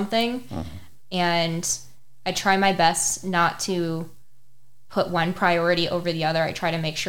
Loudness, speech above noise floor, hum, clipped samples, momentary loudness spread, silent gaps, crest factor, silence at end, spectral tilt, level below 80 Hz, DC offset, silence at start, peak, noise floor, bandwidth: -23 LUFS; 41 dB; none; under 0.1%; 12 LU; none; 20 dB; 0 s; -3.5 dB/octave; -52 dBFS; under 0.1%; 0 s; -4 dBFS; -64 dBFS; 18.5 kHz